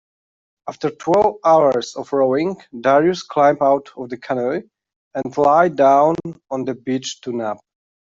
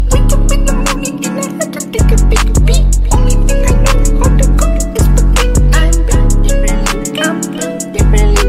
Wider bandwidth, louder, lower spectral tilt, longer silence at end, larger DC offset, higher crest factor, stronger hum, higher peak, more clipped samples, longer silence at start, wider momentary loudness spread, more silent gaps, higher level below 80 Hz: second, 7.8 kHz vs 15 kHz; second, -18 LUFS vs -12 LUFS; about the same, -5.5 dB/octave vs -5 dB/octave; first, 0.45 s vs 0 s; second, under 0.1% vs 0.8%; first, 16 dB vs 8 dB; neither; about the same, -2 dBFS vs 0 dBFS; neither; first, 0.65 s vs 0 s; first, 14 LU vs 6 LU; first, 4.96-5.11 s vs none; second, -60 dBFS vs -10 dBFS